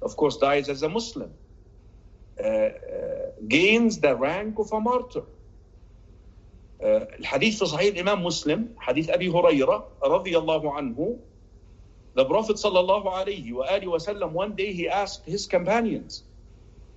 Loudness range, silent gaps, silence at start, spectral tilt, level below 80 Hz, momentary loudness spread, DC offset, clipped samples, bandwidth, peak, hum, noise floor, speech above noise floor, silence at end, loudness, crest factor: 4 LU; none; 0 s; -4.5 dB/octave; -50 dBFS; 12 LU; under 0.1%; under 0.1%; 8.2 kHz; -6 dBFS; none; -50 dBFS; 26 dB; 0.1 s; -25 LUFS; 20 dB